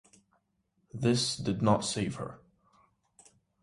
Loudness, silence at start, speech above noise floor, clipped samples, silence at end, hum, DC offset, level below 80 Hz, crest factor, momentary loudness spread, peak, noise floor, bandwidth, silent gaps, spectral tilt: -30 LUFS; 0.95 s; 46 dB; under 0.1%; 1.25 s; none; under 0.1%; -60 dBFS; 22 dB; 15 LU; -12 dBFS; -76 dBFS; 11.5 kHz; none; -5 dB/octave